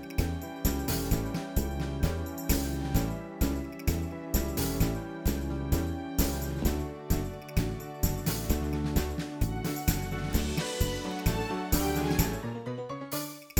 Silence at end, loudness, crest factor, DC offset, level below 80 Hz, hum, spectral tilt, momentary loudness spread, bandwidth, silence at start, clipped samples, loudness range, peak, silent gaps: 0 s; -32 LUFS; 20 dB; under 0.1%; -36 dBFS; none; -5 dB/octave; 6 LU; 19.5 kHz; 0 s; under 0.1%; 1 LU; -10 dBFS; none